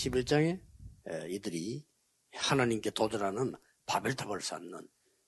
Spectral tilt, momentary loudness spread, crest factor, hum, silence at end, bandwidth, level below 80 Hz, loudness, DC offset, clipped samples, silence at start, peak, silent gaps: -4.5 dB/octave; 16 LU; 20 dB; none; 0.45 s; 12.5 kHz; -58 dBFS; -34 LUFS; under 0.1%; under 0.1%; 0 s; -14 dBFS; none